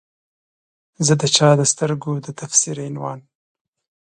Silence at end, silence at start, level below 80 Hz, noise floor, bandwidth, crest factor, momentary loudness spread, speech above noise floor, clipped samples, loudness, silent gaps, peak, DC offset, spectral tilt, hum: 0.85 s; 1 s; -62 dBFS; under -90 dBFS; 11 kHz; 20 dB; 15 LU; over 72 dB; under 0.1%; -17 LUFS; none; 0 dBFS; under 0.1%; -3.5 dB/octave; none